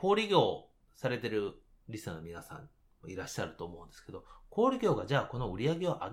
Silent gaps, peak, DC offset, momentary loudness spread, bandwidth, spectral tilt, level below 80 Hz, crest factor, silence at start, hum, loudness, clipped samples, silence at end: none; -12 dBFS; under 0.1%; 21 LU; 16 kHz; -6 dB/octave; -58 dBFS; 22 dB; 0 s; none; -33 LUFS; under 0.1%; 0 s